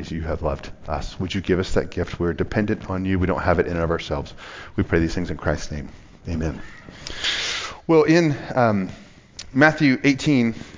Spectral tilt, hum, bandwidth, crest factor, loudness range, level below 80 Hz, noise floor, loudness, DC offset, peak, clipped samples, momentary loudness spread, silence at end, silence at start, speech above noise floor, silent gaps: -6 dB/octave; none; 7.6 kHz; 20 dB; 6 LU; -36 dBFS; -41 dBFS; -22 LUFS; under 0.1%; -2 dBFS; under 0.1%; 17 LU; 0 s; 0 s; 20 dB; none